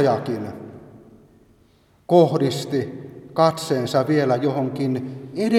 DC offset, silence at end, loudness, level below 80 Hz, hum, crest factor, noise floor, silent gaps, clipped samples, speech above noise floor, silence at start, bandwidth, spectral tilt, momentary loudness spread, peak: under 0.1%; 0 s; -21 LUFS; -62 dBFS; none; 20 dB; -57 dBFS; none; under 0.1%; 37 dB; 0 s; 16 kHz; -6.5 dB/octave; 16 LU; -2 dBFS